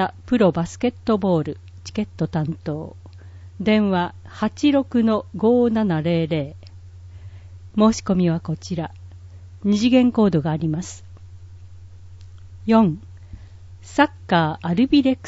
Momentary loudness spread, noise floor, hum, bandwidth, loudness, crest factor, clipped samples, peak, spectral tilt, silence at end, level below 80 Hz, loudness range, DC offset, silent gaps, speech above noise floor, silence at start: 18 LU; -41 dBFS; none; 8 kHz; -20 LUFS; 18 dB; under 0.1%; -4 dBFS; -6.5 dB/octave; 0 s; -48 dBFS; 4 LU; under 0.1%; none; 21 dB; 0 s